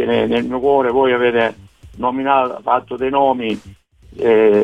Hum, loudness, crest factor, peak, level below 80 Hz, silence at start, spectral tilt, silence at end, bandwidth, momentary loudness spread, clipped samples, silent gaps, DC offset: none; -16 LUFS; 14 dB; -2 dBFS; -48 dBFS; 0 s; -7 dB/octave; 0 s; 8 kHz; 7 LU; under 0.1%; none; under 0.1%